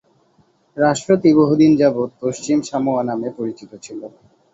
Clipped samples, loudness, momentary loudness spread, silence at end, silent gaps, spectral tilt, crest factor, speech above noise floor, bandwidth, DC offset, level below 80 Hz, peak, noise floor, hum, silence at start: under 0.1%; -17 LUFS; 21 LU; 0.45 s; none; -6.5 dB/octave; 16 dB; 41 dB; 8 kHz; under 0.1%; -58 dBFS; -2 dBFS; -58 dBFS; none; 0.75 s